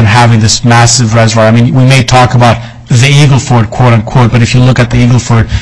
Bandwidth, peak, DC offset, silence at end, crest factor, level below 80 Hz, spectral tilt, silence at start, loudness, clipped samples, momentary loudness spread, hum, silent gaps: 11 kHz; 0 dBFS; 3%; 0 s; 6 dB; -26 dBFS; -5 dB/octave; 0 s; -5 LUFS; 2%; 3 LU; none; none